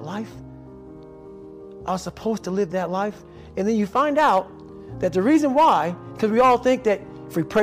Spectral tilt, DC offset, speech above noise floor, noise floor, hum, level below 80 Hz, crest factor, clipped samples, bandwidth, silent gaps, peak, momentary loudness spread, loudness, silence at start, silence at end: -6 dB/octave; under 0.1%; 21 dB; -41 dBFS; none; -52 dBFS; 14 dB; under 0.1%; 16 kHz; none; -10 dBFS; 25 LU; -21 LUFS; 0 s; 0 s